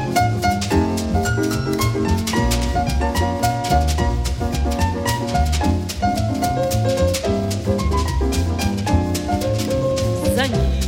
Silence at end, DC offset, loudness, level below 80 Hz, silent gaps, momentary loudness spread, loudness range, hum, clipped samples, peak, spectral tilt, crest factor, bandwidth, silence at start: 0 s; under 0.1%; -20 LUFS; -26 dBFS; none; 3 LU; 1 LU; none; under 0.1%; -4 dBFS; -5.5 dB/octave; 14 dB; 17 kHz; 0 s